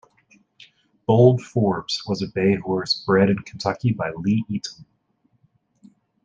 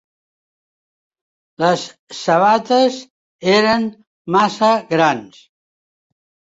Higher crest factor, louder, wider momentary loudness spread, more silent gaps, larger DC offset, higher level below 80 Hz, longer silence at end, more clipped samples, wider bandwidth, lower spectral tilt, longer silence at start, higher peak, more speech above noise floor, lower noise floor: about the same, 20 dB vs 16 dB; second, -21 LUFS vs -16 LUFS; about the same, 11 LU vs 13 LU; second, none vs 1.99-2.07 s, 3.10-3.39 s, 4.07-4.25 s; neither; about the same, -58 dBFS vs -62 dBFS; first, 1.4 s vs 1.25 s; neither; about the same, 7.8 kHz vs 8 kHz; first, -6.5 dB/octave vs -4.5 dB/octave; second, 1.1 s vs 1.6 s; about the same, -2 dBFS vs -2 dBFS; second, 46 dB vs over 74 dB; second, -66 dBFS vs under -90 dBFS